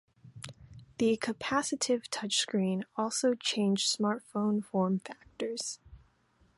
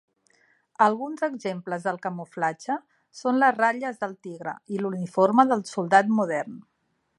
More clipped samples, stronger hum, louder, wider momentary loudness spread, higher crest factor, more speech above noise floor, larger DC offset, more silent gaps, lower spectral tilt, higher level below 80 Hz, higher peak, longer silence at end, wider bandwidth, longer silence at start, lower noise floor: neither; neither; second, -31 LUFS vs -25 LUFS; first, 18 LU vs 13 LU; about the same, 18 dB vs 22 dB; about the same, 37 dB vs 40 dB; neither; neither; second, -4 dB/octave vs -6 dB/octave; first, -66 dBFS vs -80 dBFS; second, -16 dBFS vs -4 dBFS; about the same, 0.6 s vs 0.6 s; about the same, 11.5 kHz vs 11.5 kHz; second, 0.25 s vs 0.8 s; first, -68 dBFS vs -64 dBFS